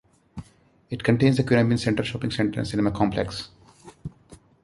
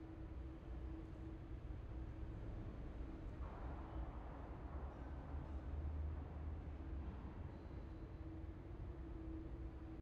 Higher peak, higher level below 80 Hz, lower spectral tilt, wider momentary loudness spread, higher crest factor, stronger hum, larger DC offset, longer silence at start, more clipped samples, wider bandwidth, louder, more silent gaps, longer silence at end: first, -4 dBFS vs -36 dBFS; about the same, -48 dBFS vs -52 dBFS; second, -6.5 dB/octave vs -8.5 dB/octave; first, 22 LU vs 5 LU; first, 20 dB vs 14 dB; neither; neither; first, 0.35 s vs 0 s; neither; first, 11.5 kHz vs 5.2 kHz; first, -23 LUFS vs -52 LUFS; neither; first, 0.3 s vs 0 s